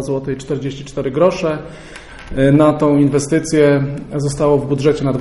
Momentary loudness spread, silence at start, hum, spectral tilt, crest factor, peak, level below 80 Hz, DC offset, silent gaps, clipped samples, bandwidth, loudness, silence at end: 14 LU; 0 s; none; -7 dB/octave; 14 dB; -2 dBFS; -38 dBFS; under 0.1%; none; under 0.1%; 11.5 kHz; -15 LUFS; 0 s